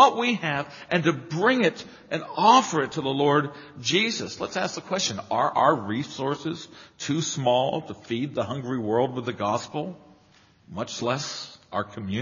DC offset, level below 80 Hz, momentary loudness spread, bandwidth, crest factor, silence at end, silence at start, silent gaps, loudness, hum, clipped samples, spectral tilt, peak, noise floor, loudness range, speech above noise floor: under 0.1%; -66 dBFS; 12 LU; 7.4 kHz; 22 dB; 0 s; 0 s; none; -25 LUFS; none; under 0.1%; -3.5 dB/octave; -2 dBFS; -58 dBFS; 7 LU; 32 dB